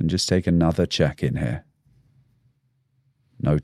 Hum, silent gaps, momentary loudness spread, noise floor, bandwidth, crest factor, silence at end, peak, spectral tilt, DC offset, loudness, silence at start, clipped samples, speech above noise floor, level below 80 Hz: none; none; 8 LU; -67 dBFS; 13.5 kHz; 18 dB; 0 s; -6 dBFS; -6 dB/octave; under 0.1%; -23 LUFS; 0 s; under 0.1%; 46 dB; -42 dBFS